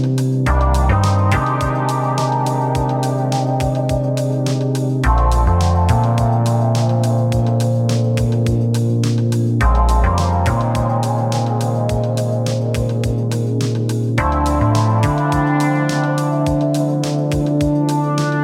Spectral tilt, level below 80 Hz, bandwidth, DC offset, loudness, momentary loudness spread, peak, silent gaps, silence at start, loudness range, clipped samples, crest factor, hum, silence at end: -7 dB/octave; -24 dBFS; 14 kHz; under 0.1%; -17 LUFS; 4 LU; -2 dBFS; none; 0 s; 2 LU; under 0.1%; 14 dB; none; 0 s